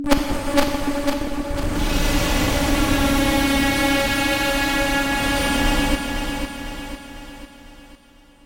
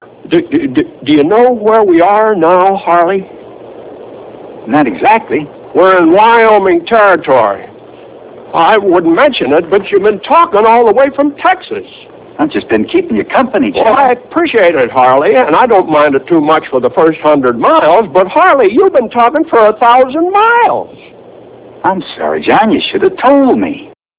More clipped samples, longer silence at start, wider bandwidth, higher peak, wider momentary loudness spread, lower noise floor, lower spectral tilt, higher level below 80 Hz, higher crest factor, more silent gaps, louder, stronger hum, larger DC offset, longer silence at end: second, under 0.1% vs 2%; second, 0 s vs 0.25 s; first, 17 kHz vs 4 kHz; second, -4 dBFS vs 0 dBFS; first, 13 LU vs 9 LU; first, -50 dBFS vs -34 dBFS; second, -4 dB/octave vs -9 dB/octave; first, -28 dBFS vs -48 dBFS; first, 16 dB vs 8 dB; neither; second, -20 LUFS vs -8 LUFS; neither; neither; first, 0.5 s vs 0.3 s